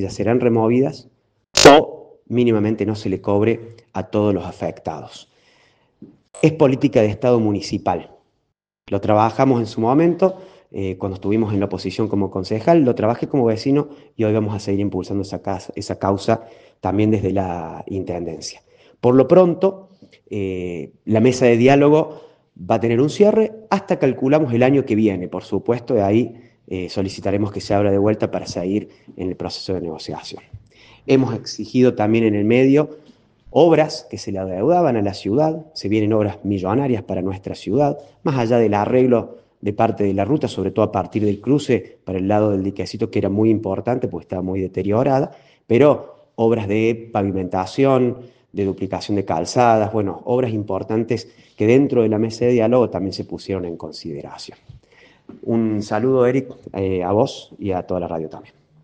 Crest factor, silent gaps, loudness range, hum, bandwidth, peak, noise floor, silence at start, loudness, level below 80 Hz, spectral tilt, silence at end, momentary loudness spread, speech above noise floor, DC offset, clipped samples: 18 dB; none; 6 LU; none; 10 kHz; 0 dBFS; -73 dBFS; 0 s; -19 LUFS; -54 dBFS; -6.5 dB/octave; 0.4 s; 13 LU; 55 dB; under 0.1%; under 0.1%